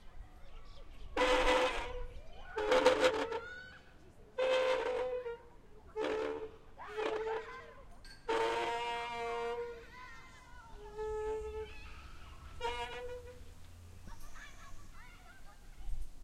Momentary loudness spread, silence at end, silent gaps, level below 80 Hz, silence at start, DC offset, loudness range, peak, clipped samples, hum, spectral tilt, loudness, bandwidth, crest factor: 25 LU; 0 s; none; -50 dBFS; 0 s; under 0.1%; 14 LU; -12 dBFS; under 0.1%; none; -3.5 dB/octave; -36 LUFS; 14 kHz; 26 dB